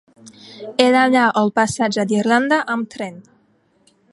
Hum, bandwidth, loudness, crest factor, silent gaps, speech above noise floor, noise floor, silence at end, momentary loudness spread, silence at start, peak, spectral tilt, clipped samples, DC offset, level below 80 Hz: none; 11.5 kHz; -17 LUFS; 18 dB; none; 42 dB; -59 dBFS; 0.9 s; 15 LU; 0.25 s; 0 dBFS; -4.5 dB/octave; under 0.1%; under 0.1%; -58 dBFS